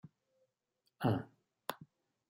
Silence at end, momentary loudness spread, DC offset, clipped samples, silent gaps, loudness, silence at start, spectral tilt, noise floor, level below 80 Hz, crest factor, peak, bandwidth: 0.45 s; 20 LU; under 0.1%; under 0.1%; none; -40 LUFS; 1 s; -7 dB/octave; -84 dBFS; -78 dBFS; 24 dB; -18 dBFS; 16 kHz